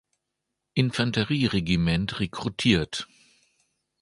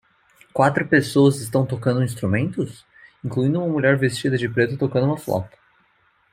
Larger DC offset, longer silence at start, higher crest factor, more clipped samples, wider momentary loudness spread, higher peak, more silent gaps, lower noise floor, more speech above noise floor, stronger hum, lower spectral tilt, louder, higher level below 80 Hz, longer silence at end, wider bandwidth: neither; first, 0.75 s vs 0.55 s; about the same, 20 dB vs 18 dB; neither; about the same, 9 LU vs 11 LU; second, -6 dBFS vs -2 dBFS; neither; first, -82 dBFS vs -62 dBFS; first, 58 dB vs 42 dB; neither; about the same, -5.5 dB/octave vs -6.5 dB/octave; second, -25 LUFS vs -21 LUFS; first, -46 dBFS vs -58 dBFS; first, 1 s vs 0.85 s; second, 11.5 kHz vs 16 kHz